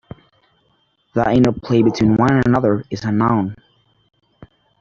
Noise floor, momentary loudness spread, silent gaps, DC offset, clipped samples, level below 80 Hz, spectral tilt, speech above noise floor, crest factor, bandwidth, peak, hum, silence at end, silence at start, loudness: -62 dBFS; 7 LU; none; under 0.1%; under 0.1%; -46 dBFS; -8 dB/octave; 47 dB; 16 dB; 7.6 kHz; -2 dBFS; none; 1.25 s; 1.15 s; -17 LUFS